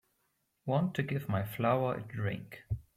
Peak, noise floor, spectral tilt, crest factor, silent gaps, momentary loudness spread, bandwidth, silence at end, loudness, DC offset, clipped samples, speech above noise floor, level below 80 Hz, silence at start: -16 dBFS; -78 dBFS; -8 dB/octave; 18 dB; none; 11 LU; 16 kHz; 0.15 s; -34 LUFS; under 0.1%; under 0.1%; 45 dB; -58 dBFS; 0.65 s